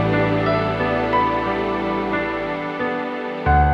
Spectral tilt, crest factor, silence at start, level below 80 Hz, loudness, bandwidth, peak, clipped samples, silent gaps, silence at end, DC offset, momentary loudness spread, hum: -8 dB/octave; 14 dB; 0 s; -32 dBFS; -21 LUFS; 7.4 kHz; -6 dBFS; under 0.1%; none; 0 s; under 0.1%; 6 LU; none